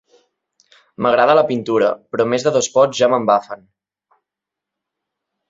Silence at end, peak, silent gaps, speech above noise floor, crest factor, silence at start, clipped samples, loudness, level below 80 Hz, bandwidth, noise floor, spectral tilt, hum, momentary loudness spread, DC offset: 1.95 s; -2 dBFS; none; 69 dB; 18 dB; 1 s; under 0.1%; -16 LUFS; -62 dBFS; 8 kHz; -84 dBFS; -4 dB/octave; 50 Hz at -55 dBFS; 7 LU; under 0.1%